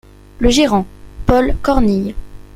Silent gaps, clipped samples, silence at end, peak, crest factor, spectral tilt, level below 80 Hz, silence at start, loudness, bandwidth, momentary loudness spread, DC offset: none; under 0.1%; 0.15 s; 0 dBFS; 14 dB; -5.5 dB/octave; -24 dBFS; 0.4 s; -15 LUFS; 15.5 kHz; 13 LU; under 0.1%